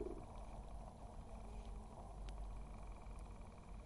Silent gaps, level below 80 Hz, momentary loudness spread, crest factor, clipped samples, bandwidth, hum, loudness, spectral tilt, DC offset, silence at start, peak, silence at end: none; -54 dBFS; 3 LU; 16 dB; under 0.1%; 11.5 kHz; none; -55 LUFS; -6.5 dB/octave; under 0.1%; 0 s; -36 dBFS; 0 s